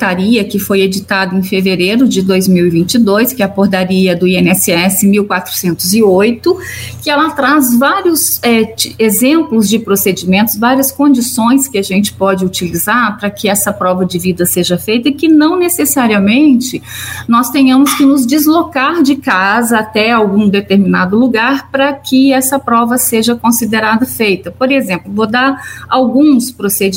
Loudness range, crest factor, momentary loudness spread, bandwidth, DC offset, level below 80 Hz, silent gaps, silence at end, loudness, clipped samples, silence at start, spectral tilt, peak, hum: 2 LU; 10 dB; 5 LU; 16.5 kHz; under 0.1%; -46 dBFS; none; 0 s; -10 LUFS; under 0.1%; 0 s; -4.5 dB/octave; 0 dBFS; none